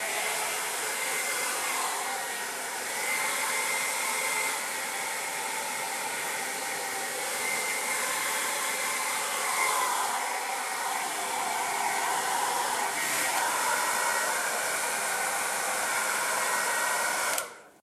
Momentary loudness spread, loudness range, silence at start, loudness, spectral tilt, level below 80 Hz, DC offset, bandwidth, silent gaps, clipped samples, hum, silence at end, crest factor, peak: 5 LU; 2 LU; 0 s; -28 LUFS; 1 dB/octave; -80 dBFS; under 0.1%; 15 kHz; none; under 0.1%; none; 0.1 s; 18 dB; -12 dBFS